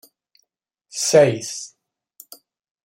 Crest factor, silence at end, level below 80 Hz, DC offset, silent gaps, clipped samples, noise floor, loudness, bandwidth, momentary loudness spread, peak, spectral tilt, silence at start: 22 dB; 1.2 s; -68 dBFS; under 0.1%; none; under 0.1%; -75 dBFS; -18 LUFS; 16.5 kHz; 19 LU; -2 dBFS; -3.5 dB/octave; 0.95 s